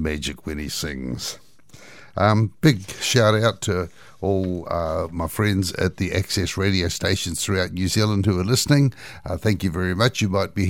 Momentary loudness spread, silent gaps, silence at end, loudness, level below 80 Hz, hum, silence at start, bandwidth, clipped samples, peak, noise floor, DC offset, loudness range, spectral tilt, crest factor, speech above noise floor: 10 LU; none; 0 s; -22 LUFS; -42 dBFS; none; 0 s; 17 kHz; under 0.1%; -2 dBFS; -48 dBFS; 0.4%; 2 LU; -5 dB/octave; 20 dB; 26 dB